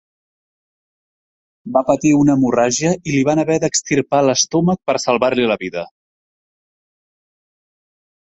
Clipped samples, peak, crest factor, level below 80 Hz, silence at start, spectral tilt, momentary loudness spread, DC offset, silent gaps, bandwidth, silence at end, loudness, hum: under 0.1%; -2 dBFS; 16 dB; -54 dBFS; 1.65 s; -4.5 dB/octave; 6 LU; under 0.1%; none; 8.2 kHz; 2.4 s; -16 LUFS; none